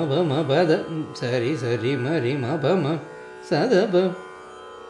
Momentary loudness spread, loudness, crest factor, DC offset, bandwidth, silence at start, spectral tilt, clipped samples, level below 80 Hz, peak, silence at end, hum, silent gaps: 18 LU; -23 LUFS; 16 dB; under 0.1%; 10.5 kHz; 0 s; -7 dB/octave; under 0.1%; -68 dBFS; -6 dBFS; 0 s; none; none